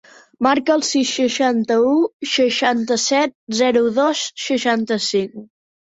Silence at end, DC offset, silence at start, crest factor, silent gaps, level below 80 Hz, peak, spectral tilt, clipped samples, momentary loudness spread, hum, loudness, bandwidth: 0.45 s; under 0.1%; 0.4 s; 14 dB; 2.13-2.20 s, 3.35-3.47 s; -64 dBFS; -4 dBFS; -3 dB/octave; under 0.1%; 5 LU; none; -18 LUFS; 8 kHz